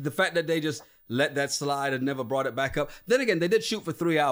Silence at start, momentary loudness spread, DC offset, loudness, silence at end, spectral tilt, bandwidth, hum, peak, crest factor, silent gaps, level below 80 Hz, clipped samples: 0 s; 7 LU; under 0.1%; -27 LUFS; 0 s; -4.5 dB/octave; 16.5 kHz; none; -10 dBFS; 16 dB; none; -56 dBFS; under 0.1%